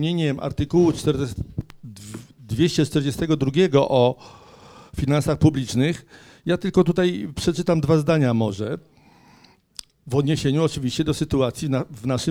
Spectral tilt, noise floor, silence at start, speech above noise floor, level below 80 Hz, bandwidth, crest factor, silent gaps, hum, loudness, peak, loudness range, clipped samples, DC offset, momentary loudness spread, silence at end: -6.5 dB/octave; -54 dBFS; 0 s; 33 dB; -44 dBFS; 16 kHz; 18 dB; none; none; -21 LUFS; -4 dBFS; 3 LU; under 0.1%; under 0.1%; 18 LU; 0 s